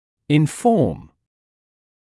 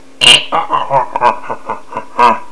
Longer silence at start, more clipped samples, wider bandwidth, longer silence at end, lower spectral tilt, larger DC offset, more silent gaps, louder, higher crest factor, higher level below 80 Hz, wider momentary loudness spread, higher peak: first, 0.3 s vs 0 s; second, under 0.1% vs 1%; about the same, 12 kHz vs 11 kHz; first, 1.15 s vs 0.05 s; first, -7 dB/octave vs -1 dB/octave; second, under 0.1% vs 5%; neither; second, -19 LUFS vs -10 LUFS; first, 18 dB vs 12 dB; about the same, -52 dBFS vs -48 dBFS; second, 7 LU vs 18 LU; second, -4 dBFS vs 0 dBFS